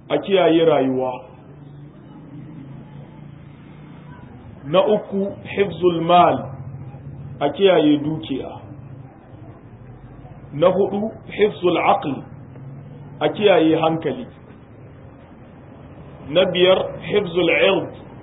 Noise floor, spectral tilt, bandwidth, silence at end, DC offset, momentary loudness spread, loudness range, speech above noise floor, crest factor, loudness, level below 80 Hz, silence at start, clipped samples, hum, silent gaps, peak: -42 dBFS; -11 dB/octave; 4 kHz; 0 s; under 0.1%; 25 LU; 6 LU; 25 dB; 18 dB; -18 LUFS; -52 dBFS; 0.1 s; under 0.1%; none; none; -2 dBFS